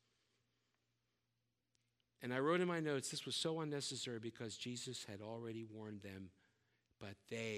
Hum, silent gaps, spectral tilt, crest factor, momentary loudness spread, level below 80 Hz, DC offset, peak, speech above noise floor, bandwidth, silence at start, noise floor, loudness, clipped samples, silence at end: none; none; -4 dB/octave; 22 dB; 17 LU; -88 dBFS; under 0.1%; -24 dBFS; 44 dB; 15 kHz; 2.2 s; -88 dBFS; -44 LUFS; under 0.1%; 0 s